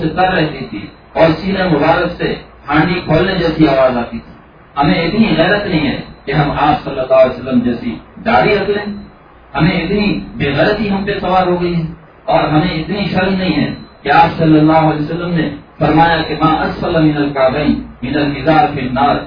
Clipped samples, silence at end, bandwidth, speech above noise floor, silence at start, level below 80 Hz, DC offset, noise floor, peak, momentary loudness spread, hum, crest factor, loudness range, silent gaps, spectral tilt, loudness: under 0.1%; 0 s; 5.2 kHz; 26 dB; 0 s; -34 dBFS; under 0.1%; -39 dBFS; 0 dBFS; 10 LU; none; 14 dB; 3 LU; none; -9 dB/octave; -13 LUFS